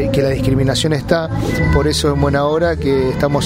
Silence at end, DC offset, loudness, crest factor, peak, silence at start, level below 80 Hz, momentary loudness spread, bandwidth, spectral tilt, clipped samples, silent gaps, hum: 0 s; under 0.1%; -15 LUFS; 14 dB; 0 dBFS; 0 s; -26 dBFS; 2 LU; 16 kHz; -6 dB/octave; under 0.1%; none; none